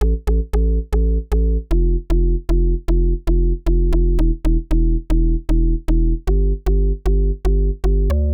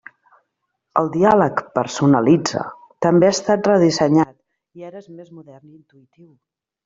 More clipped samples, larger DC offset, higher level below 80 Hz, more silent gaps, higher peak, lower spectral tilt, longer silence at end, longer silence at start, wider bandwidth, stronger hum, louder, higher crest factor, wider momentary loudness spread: neither; first, 0.4% vs under 0.1%; first, -16 dBFS vs -56 dBFS; neither; second, -8 dBFS vs -2 dBFS; first, -9 dB/octave vs -6 dB/octave; second, 0 s vs 1.45 s; second, 0 s vs 0.95 s; second, 4.1 kHz vs 7.8 kHz; neither; second, -20 LUFS vs -17 LUFS; second, 8 dB vs 16 dB; second, 1 LU vs 21 LU